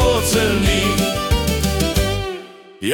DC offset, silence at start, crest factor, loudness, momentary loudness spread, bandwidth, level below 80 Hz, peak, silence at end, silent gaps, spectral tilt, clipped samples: under 0.1%; 0 s; 14 dB; -18 LUFS; 10 LU; 18 kHz; -26 dBFS; -4 dBFS; 0 s; none; -4.5 dB/octave; under 0.1%